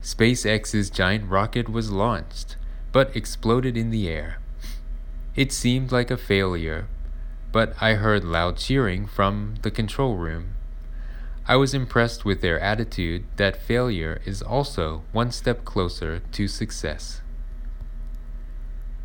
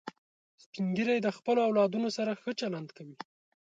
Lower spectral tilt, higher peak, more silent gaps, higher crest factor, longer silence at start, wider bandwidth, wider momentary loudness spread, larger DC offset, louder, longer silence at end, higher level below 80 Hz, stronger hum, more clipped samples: about the same, -5.5 dB/octave vs -6 dB/octave; first, -4 dBFS vs -16 dBFS; second, none vs 0.18-0.58 s, 0.66-0.73 s; about the same, 20 dB vs 16 dB; about the same, 0 s vs 0.05 s; first, 18 kHz vs 8.6 kHz; second, 17 LU vs 21 LU; neither; first, -24 LUFS vs -31 LUFS; second, 0 s vs 0.45 s; first, -32 dBFS vs -80 dBFS; neither; neither